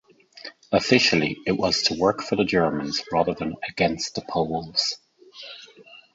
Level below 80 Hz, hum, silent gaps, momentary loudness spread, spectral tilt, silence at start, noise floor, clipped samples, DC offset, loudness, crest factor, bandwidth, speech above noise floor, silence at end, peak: -54 dBFS; none; none; 20 LU; -4 dB/octave; 0.35 s; -49 dBFS; under 0.1%; under 0.1%; -23 LUFS; 22 dB; 8 kHz; 26 dB; 0.15 s; -4 dBFS